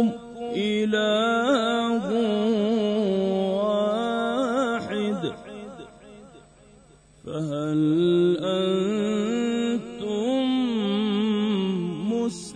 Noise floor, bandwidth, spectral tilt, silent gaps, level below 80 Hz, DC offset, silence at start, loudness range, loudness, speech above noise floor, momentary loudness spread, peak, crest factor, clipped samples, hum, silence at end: -53 dBFS; 10 kHz; -6 dB/octave; none; -60 dBFS; under 0.1%; 0 s; 6 LU; -24 LUFS; 31 dB; 9 LU; -10 dBFS; 14 dB; under 0.1%; none; 0 s